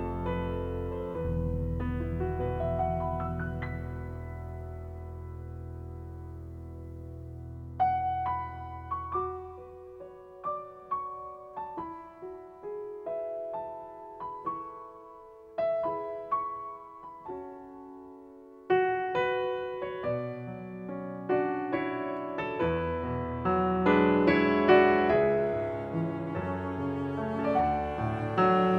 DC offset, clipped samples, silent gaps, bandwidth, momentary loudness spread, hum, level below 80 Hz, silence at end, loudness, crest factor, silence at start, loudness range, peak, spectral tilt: under 0.1%; under 0.1%; none; 6.6 kHz; 19 LU; none; -46 dBFS; 0 s; -31 LUFS; 24 dB; 0 s; 14 LU; -8 dBFS; -9 dB/octave